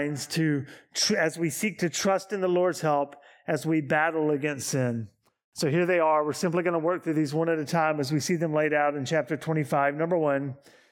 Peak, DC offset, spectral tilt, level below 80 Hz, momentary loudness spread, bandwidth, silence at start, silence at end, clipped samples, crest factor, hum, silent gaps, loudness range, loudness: -10 dBFS; under 0.1%; -5 dB/octave; -74 dBFS; 7 LU; 18 kHz; 0 s; 0.35 s; under 0.1%; 16 dB; none; 5.44-5.52 s; 1 LU; -26 LUFS